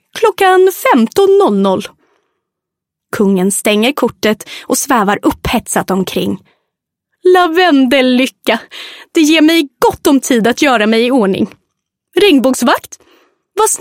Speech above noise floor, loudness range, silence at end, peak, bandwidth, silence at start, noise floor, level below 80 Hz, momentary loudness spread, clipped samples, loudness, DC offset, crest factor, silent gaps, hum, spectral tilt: 68 dB; 4 LU; 0.05 s; 0 dBFS; 16.5 kHz; 0.15 s; -79 dBFS; -42 dBFS; 9 LU; under 0.1%; -11 LUFS; under 0.1%; 12 dB; none; none; -4 dB/octave